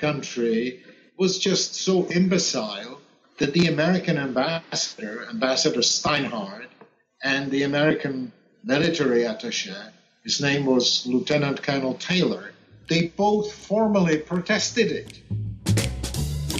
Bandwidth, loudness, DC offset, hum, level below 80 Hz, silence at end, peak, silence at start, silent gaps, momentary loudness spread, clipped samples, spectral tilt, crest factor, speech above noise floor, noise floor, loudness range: 13 kHz; -23 LUFS; under 0.1%; none; -46 dBFS; 0 s; -8 dBFS; 0 s; none; 12 LU; under 0.1%; -4 dB/octave; 16 dB; 30 dB; -53 dBFS; 2 LU